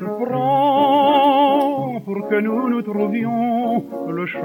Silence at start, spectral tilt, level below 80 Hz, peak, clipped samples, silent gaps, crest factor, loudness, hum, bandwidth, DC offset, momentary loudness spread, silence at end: 0 s; -7.5 dB/octave; -68 dBFS; -6 dBFS; under 0.1%; none; 12 dB; -18 LUFS; none; 17 kHz; under 0.1%; 11 LU; 0 s